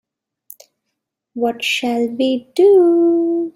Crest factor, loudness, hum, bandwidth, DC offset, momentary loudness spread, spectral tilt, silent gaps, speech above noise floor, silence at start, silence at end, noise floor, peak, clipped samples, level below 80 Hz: 14 dB; -15 LUFS; none; 16 kHz; under 0.1%; 11 LU; -4 dB/octave; none; 62 dB; 1.35 s; 0.05 s; -77 dBFS; -4 dBFS; under 0.1%; -68 dBFS